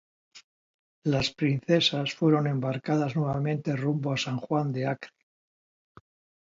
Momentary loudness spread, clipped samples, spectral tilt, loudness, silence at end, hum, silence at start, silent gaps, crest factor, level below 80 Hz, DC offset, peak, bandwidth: 7 LU; under 0.1%; -6 dB/octave; -27 LUFS; 1.45 s; none; 0.35 s; 0.44-1.02 s; 18 dB; -62 dBFS; under 0.1%; -10 dBFS; 7.6 kHz